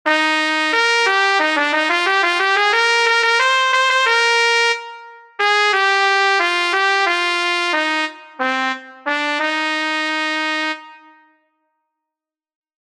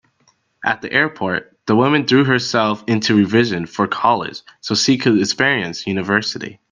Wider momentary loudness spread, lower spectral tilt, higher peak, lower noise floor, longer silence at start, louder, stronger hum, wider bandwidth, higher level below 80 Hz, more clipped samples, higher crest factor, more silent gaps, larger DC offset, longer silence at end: about the same, 8 LU vs 8 LU; second, 1 dB/octave vs -4.5 dB/octave; about the same, 0 dBFS vs 0 dBFS; first, -86 dBFS vs -60 dBFS; second, 0.05 s vs 0.6 s; about the same, -15 LUFS vs -17 LUFS; neither; first, 13.5 kHz vs 10 kHz; second, -70 dBFS vs -60 dBFS; neither; about the same, 18 dB vs 18 dB; neither; neither; first, 2 s vs 0.2 s